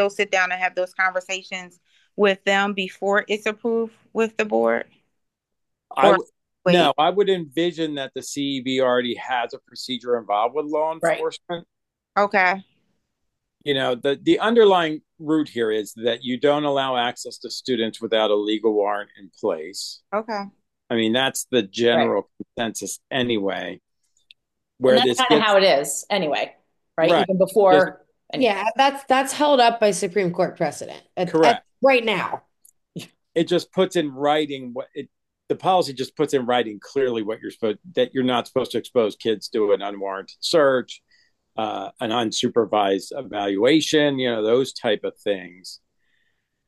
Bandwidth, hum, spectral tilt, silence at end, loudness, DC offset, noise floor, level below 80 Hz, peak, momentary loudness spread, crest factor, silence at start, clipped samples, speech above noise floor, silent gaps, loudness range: 12.5 kHz; none; -4 dB/octave; 0.9 s; -21 LUFS; under 0.1%; -80 dBFS; -70 dBFS; 0 dBFS; 14 LU; 22 dB; 0 s; under 0.1%; 59 dB; none; 5 LU